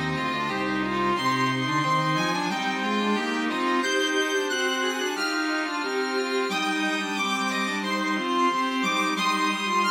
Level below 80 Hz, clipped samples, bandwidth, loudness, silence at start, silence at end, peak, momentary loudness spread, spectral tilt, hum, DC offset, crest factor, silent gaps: -62 dBFS; under 0.1%; 17.5 kHz; -25 LUFS; 0 s; 0 s; -12 dBFS; 3 LU; -3.5 dB/octave; none; under 0.1%; 14 dB; none